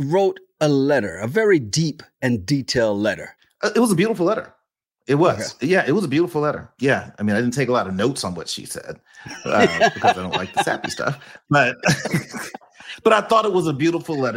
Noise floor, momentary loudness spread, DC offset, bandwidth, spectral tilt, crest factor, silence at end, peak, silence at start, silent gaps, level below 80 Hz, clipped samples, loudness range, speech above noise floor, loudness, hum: -74 dBFS; 14 LU; under 0.1%; 16.5 kHz; -5 dB/octave; 18 dB; 0 s; -2 dBFS; 0 s; none; -58 dBFS; under 0.1%; 2 LU; 55 dB; -20 LUFS; none